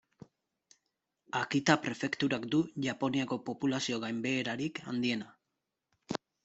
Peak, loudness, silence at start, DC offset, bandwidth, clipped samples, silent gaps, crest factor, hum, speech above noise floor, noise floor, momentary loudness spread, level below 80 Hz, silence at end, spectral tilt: -8 dBFS; -33 LUFS; 1.35 s; under 0.1%; 8.2 kHz; under 0.1%; none; 26 dB; none; 54 dB; -86 dBFS; 9 LU; -72 dBFS; 0.3 s; -4.5 dB/octave